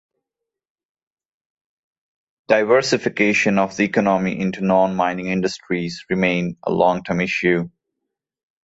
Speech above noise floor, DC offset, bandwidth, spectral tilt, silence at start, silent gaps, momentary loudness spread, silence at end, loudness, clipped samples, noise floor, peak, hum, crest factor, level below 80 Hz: 65 dB; under 0.1%; 8 kHz; -5.5 dB/octave; 2.5 s; none; 7 LU; 0.95 s; -19 LUFS; under 0.1%; -84 dBFS; -2 dBFS; none; 18 dB; -56 dBFS